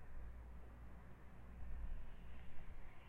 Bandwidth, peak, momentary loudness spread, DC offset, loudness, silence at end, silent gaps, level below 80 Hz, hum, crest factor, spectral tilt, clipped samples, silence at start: 3.7 kHz; -34 dBFS; 7 LU; under 0.1%; -58 LUFS; 0 s; none; -52 dBFS; none; 14 dB; -7.5 dB/octave; under 0.1%; 0 s